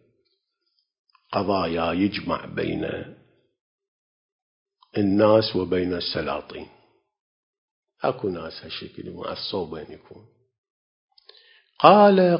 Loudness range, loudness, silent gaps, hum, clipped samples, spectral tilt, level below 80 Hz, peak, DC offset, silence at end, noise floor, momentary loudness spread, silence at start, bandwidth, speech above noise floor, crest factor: 8 LU; -22 LUFS; 3.61-3.78 s, 3.88-4.66 s, 7.20-7.83 s, 10.58-10.64 s, 10.70-11.08 s; none; under 0.1%; -9 dB/octave; -54 dBFS; 0 dBFS; under 0.1%; 0 s; -74 dBFS; 19 LU; 1.3 s; 5.6 kHz; 53 dB; 24 dB